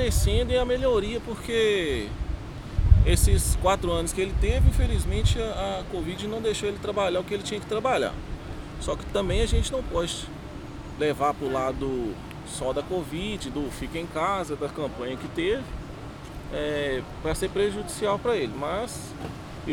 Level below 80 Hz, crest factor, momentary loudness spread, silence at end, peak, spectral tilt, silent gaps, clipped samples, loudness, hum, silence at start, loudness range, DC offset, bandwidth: -30 dBFS; 22 dB; 14 LU; 0 s; -4 dBFS; -5 dB/octave; none; under 0.1%; -27 LUFS; none; 0 s; 6 LU; 0.1%; 17 kHz